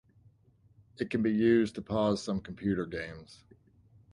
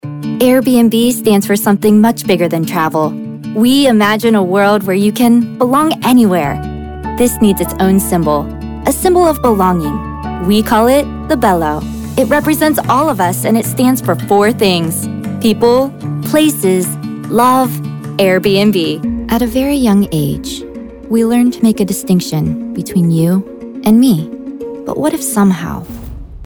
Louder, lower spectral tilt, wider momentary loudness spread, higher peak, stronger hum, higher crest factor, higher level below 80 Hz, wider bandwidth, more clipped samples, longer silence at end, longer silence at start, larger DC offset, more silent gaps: second, -31 LUFS vs -12 LUFS; about the same, -6.5 dB/octave vs -5.5 dB/octave; first, 14 LU vs 11 LU; second, -14 dBFS vs 0 dBFS; neither; first, 18 dB vs 12 dB; second, -58 dBFS vs -34 dBFS; second, 11 kHz vs 20 kHz; neither; first, 0.8 s vs 0 s; first, 1 s vs 0.05 s; neither; neither